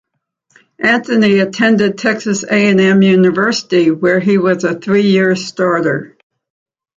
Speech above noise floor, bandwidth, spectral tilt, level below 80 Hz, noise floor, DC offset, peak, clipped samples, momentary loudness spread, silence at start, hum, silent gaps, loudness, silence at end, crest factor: 51 dB; 7.8 kHz; -5.5 dB/octave; -58 dBFS; -63 dBFS; under 0.1%; 0 dBFS; under 0.1%; 6 LU; 0.8 s; none; none; -12 LUFS; 0.9 s; 12 dB